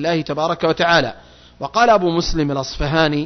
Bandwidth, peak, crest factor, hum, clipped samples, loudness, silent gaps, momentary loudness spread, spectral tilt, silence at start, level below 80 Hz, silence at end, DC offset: 6.4 kHz; -2 dBFS; 14 dB; none; under 0.1%; -17 LUFS; none; 9 LU; -5 dB/octave; 0 s; -34 dBFS; 0 s; under 0.1%